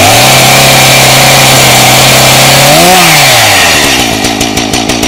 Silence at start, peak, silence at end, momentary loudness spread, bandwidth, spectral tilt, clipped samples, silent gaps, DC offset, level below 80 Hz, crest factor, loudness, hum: 0 s; 0 dBFS; 0 s; 7 LU; over 20 kHz; -2.5 dB/octave; 20%; none; under 0.1%; -28 dBFS; 4 dB; -2 LUFS; none